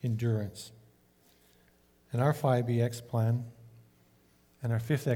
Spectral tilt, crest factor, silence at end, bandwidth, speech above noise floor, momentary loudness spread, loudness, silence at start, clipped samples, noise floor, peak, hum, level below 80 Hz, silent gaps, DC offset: -7.5 dB/octave; 18 dB; 0 s; 16.5 kHz; 35 dB; 14 LU; -31 LUFS; 0.05 s; under 0.1%; -65 dBFS; -14 dBFS; none; -68 dBFS; none; under 0.1%